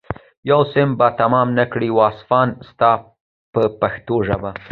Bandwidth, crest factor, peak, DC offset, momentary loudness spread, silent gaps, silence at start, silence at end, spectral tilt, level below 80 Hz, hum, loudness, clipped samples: 4.8 kHz; 16 dB; 0 dBFS; under 0.1%; 7 LU; 0.37-0.43 s, 3.21-3.53 s; 0.1 s; 0.05 s; -10 dB/octave; -46 dBFS; none; -17 LUFS; under 0.1%